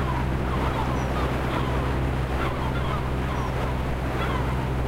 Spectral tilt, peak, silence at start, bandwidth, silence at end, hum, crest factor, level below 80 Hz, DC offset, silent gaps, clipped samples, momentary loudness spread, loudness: -7 dB/octave; -12 dBFS; 0 s; 16 kHz; 0 s; none; 12 dB; -30 dBFS; under 0.1%; none; under 0.1%; 2 LU; -26 LUFS